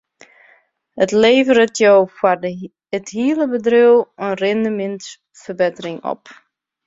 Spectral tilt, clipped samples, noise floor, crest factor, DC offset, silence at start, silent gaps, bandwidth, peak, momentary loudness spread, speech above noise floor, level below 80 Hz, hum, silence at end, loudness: -4.5 dB/octave; under 0.1%; -55 dBFS; 16 dB; under 0.1%; 0.95 s; none; 7.8 kHz; -2 dBFS; 18 LU; 39 dB; -62 dBFS; none; 0.55 s; -16 LUFS